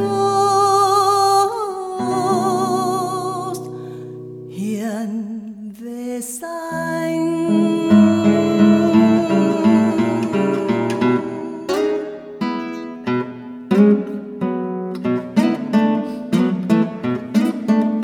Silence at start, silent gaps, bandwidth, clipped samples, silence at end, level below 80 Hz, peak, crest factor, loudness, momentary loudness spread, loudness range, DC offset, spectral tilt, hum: 0 s; none; 15 kHz; under 0.1%; 0 s; -64 dBFS; -2 dBFS; 16 dB; -18 LUFS; 14 LU; 10 LU; under 0.1%; -6 dB/octave; none